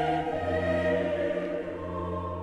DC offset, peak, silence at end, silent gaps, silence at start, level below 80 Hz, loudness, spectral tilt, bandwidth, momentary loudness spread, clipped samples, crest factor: under 0.1%; -16 dBFS; 0 s; none; 0 s; -50 dBFS; -30 LUFS; -7.5 dB/octave; 10.5 kHz; 7 LU; under 0.1%; 14 dB